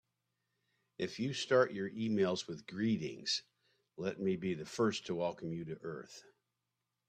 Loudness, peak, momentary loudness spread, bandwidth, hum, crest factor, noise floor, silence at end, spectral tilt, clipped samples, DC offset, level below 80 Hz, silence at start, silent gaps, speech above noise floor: -37 LUFS; -16 dBFS; 13 LU; 10 kHz; none; 22 dB; -88 dBFS; 0.9 s; -5 dB/octave; under 0.1%; under 0.1%; -76 dBFS; 1 s; none; 51 dB